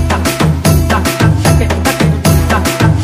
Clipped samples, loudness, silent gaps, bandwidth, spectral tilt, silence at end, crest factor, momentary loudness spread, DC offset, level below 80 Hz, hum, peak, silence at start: under 0.1%; -11 LUFS; none; 16.5 kHz; -5.5 dB/octave; 0 s; 10 dB; 2 LU; under 0.1%; -20 dBFS; none; 0 dBFS; 0 s